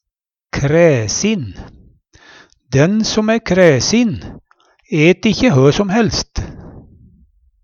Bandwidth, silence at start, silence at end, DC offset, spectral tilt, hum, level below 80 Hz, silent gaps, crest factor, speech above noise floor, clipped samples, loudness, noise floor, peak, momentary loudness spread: 7.4 kHz; 0.55 s; 0.85 s; under 0.1%; -5 dB/octave; none; -38 dBFS; none; 16 dB; 70 dB; under 0.1%; -14 LUFS; -83 dBFS; 0 dBFS; 15 LU